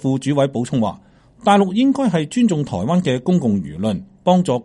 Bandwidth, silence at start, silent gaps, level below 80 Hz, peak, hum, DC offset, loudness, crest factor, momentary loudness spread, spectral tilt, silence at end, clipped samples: 11.5 kHz; 0 s; none; -52 dBFS; -2 dBFS; none; under 0.1%; -18 LUFS; 14 dB; 7 LU; -7 dB/octave; 0 s; under 0.1%